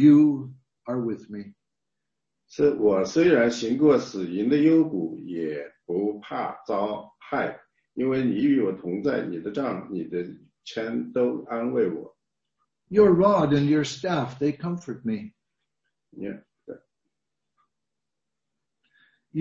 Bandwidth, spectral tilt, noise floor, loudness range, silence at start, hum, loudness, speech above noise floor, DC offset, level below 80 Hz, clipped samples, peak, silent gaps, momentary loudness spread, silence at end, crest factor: 7.6 kHz; -7 dB/octave; -87 dBFS; 15 LU; 0 s; none; -24 LUFS; 63 dB; under 0.1%; -62 dBFS; under 0.1%; -6 dBFS; none; 18 LU; 0 s; 18 dB